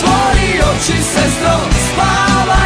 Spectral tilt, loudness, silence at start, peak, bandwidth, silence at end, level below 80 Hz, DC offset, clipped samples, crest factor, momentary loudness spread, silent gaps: -4 dB/octave; -12 LUFS; 0 s; 0 dBFS; 11 kHz; 0 s; -20 dBFS; under 0.1%; under 0.1%; 12 dB; 2 LU; none